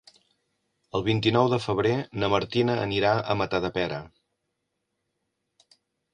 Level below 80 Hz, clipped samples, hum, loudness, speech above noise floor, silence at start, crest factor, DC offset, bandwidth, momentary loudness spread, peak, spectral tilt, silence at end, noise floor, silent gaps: -54 dBFS; under 0.1%; none; -25 LUFS; 55 dB; 0.95 s; 20 dB; under 0.1%; 10 kHz; 7 LU; -8 dBFS; -6.5 dB/octave; 2.05 s; -80 dBFS; none